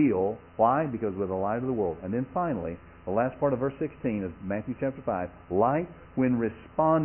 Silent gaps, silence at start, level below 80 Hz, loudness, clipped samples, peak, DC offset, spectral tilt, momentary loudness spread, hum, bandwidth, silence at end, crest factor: none; 0 s; -54 dBFS; -29 LUFS; under 0.1%; -10 dBFS; under 0.1%; -12 dB/octave; 8 LU; none; 3.2 kHz; 0 s; 18 dB